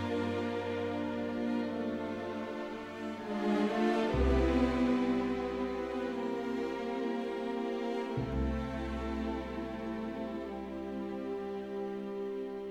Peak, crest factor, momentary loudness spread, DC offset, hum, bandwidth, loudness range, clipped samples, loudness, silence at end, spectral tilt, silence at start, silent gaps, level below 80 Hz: -18 dBFS; 16 dB; 10 LU; under 0.1%; none; 11.5 kHz; 7 LU; under 0.1%; -35 LUFS; 0 s; -7 dB/octave; 0 s; none; -44 dBFS